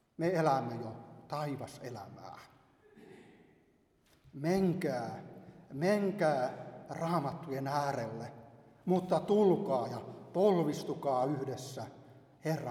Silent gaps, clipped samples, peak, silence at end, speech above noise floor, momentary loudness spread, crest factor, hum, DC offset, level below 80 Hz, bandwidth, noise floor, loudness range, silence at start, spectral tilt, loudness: none; under 0.1%; -16 dBFS; 0 s; 36 dB; 19 LU; 20 dB; none; under 0.1%; -72 dBFS; 17 kHz; -70 dBFS; 11 LU; 0.2 s; -7 dB/octave; -34 LUFS